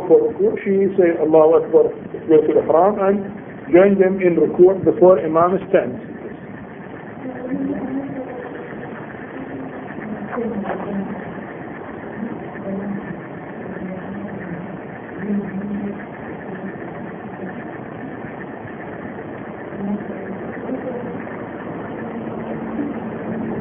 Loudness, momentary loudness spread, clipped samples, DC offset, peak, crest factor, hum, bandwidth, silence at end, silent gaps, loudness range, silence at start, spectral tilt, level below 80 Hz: -20 LUFS; 18 LU; under 0.1%; under 0.1%; 0 dBFS; 20 dB; none; 3.5 kHz; 0 s; none; 14 LU; 0 s; -12 dB/octave; -54 dBFS